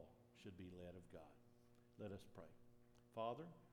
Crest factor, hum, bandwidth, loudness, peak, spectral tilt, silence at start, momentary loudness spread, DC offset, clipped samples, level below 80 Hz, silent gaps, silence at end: 22 dB; none; 14 kHz; -56 LUFS; -34 dBFS; -7 dB/octave; 0 s; 15 LU; under 0.1%; under 0.1%; -82 dBFS; none; 0 s